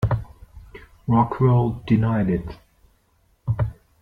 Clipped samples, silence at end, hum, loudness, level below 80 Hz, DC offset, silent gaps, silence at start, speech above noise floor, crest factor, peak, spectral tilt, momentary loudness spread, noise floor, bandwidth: under 0.1%; 0.3 s; none; -22 LUFS; -40 dBFS; under 0.1%; none; 0 s; 43 dB; 18 dB; -4 dBFS; -10.5 dB/octave; 17 LU; -63 dBFS; 4.9 kHz